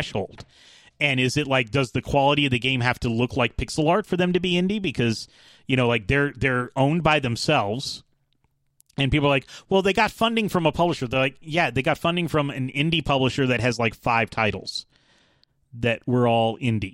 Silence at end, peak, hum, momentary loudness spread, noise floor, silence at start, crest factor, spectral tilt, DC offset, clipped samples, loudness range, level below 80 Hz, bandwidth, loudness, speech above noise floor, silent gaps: 0 s; -4 dBFS; none; 6 LU; -68 dBFS; 0 s; 20 dB; -5.5 dB/octave; under 0.1%; under 0.1%; 2 LU; -44 dBFS; 16 kHz; -22 LUFS; 46 dB; none